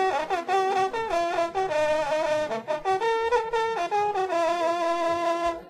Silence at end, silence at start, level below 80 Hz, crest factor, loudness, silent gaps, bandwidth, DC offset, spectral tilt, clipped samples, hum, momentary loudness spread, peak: 0 s; 0 s; -56 dBFS; 12 dB; -25 LUFS; none; 13.5 kHz; under 0.1%; -3.5 dB/octave; under 0.1%; none; 2 LU; -12 dBFS